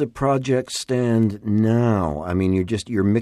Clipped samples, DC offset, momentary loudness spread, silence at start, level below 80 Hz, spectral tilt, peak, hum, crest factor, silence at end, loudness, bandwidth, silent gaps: under 0.1%; under 0.1%; 5 LU; 0 s; -46 dBFS; -7 dB/octave; -6 dBFS; none; 12 dB; 0 s; -21 LUFS; 12.5 kHz; none